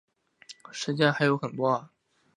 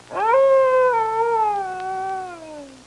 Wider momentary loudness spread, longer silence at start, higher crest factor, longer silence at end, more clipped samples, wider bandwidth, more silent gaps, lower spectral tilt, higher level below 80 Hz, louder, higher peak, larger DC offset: about the same, 15 LU vs 17 LU; first, 0.5 s vs 0.1 s; first, 22 dB vs 12 dB; first, 0.5 s vs 0.1 s; neither; about the same, 11 kHz vs 11 kHz; neither; first, -5.5 dB/octave vs -4 dB/octave; second, -74 dBFS vs -62 dBFS; second, -27 LUFS vs -19 LUFS; about the same, -8 dBFS vs -8 dBFS; neither